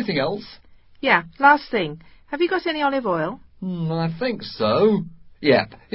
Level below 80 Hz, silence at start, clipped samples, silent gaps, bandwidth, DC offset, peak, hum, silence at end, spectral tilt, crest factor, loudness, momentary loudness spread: -56 dBFS; 0 s; under 0.1%; none; 5.8 kHz; under 0.1%; -2 dBFS; none; 0.2 s; -10.5 dB/octave; 20 dB; -21 LUFS; 14 LU